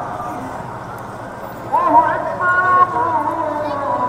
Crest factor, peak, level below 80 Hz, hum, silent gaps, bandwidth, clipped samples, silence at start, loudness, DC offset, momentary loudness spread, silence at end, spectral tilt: 18 dB; 0 dBFS; -48 dBFS; none; none; 15.5 kHz; under 0.1%; 0 s; -16 LUFS; under 0.1%; 16 LU; 0 s; -6 dB/octave